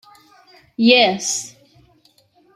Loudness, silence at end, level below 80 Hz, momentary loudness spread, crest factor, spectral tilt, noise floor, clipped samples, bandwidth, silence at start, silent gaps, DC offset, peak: -16 LUFS; 1.05 s; -66 dBFS; 24 LU; 20 dB; -2.5 dB/octave; -57 dBFS; under 0.1%; 13.5 kHz; 0.8 s; none; under 0.1%; -2 dBFS